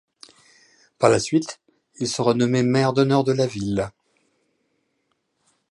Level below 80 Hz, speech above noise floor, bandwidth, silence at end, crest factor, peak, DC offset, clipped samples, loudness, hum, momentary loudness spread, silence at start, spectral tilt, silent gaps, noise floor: -56 dBFS; 52 dB; 11.5 kHz; 1.8 s; 22 dB; -2 dBFS; under 0.1%; under 0.1%; -21 LUFS; none; 11 LU; 1 s; -5.5 dB/octave; none; -72 dBFS